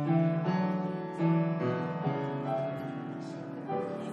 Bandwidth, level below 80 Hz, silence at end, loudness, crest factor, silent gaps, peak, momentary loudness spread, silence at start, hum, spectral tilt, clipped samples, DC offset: 6.4 kHz; -78 dBFS; 0 s; -32 LUFS; 14 dB; none; -16 dBFS; 11 LU; 0 s; none; -9 dB/octave; under 0.1%; under 0.1%